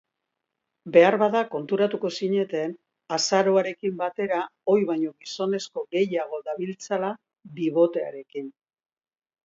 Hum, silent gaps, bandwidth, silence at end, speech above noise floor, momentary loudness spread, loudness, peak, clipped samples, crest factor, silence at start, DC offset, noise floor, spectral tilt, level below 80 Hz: none; none; 7.8 kHz; 0.95 s; 58 dB; 12 LU; -25 LUFS; -4 dBFS; under 0.1%; 22 dB; 0.85 s; under 0.1%; -83 dBFS; -4.5 dB/octave; -78 dBFS